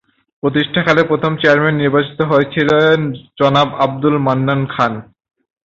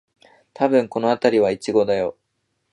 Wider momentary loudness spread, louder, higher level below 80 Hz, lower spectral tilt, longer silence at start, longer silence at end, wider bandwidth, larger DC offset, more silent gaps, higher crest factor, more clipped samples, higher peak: about the same, 6 LU vs 6 LU; first, -14 LUFS vs -20 LUFS; first, -52 dBFS vs -62 dBFS; about the same, -7 dB/octave vs -6 dB/octave; second, 0.45 s vs 0.6 s; about the same, 0.65 s vs 0.6 s; second, 7.6 kHz vs 11 kHz; neither; neither; about the same, 14 dB vs 18 dB; neither; about the same, 0 dBFS vs -2 dBFS